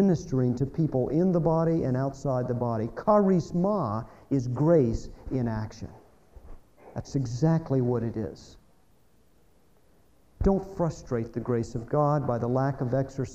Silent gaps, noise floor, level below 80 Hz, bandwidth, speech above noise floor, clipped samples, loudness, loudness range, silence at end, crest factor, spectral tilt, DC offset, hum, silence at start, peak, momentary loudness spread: none; -64 dBFS; -46 dBFS; 8.2 kHz; 38 dB; under 0.1%; -27 LUFS; 6 LU; 0 s; 18 dB; -9 dB/octave; under 0.1%; none; 0 s; -10 dBFS; 11 LU